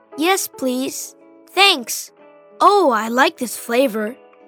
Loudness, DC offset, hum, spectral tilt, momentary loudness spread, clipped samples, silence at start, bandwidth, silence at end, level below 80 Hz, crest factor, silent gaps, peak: -17 LUFS; under 0.1%; none; -1.5 dB/octave; 14 LU; under 0.1%; 0.1 s; over 20 kHz; 0.35 s; -78 dBFS; 18 dB; none; 0 dBFS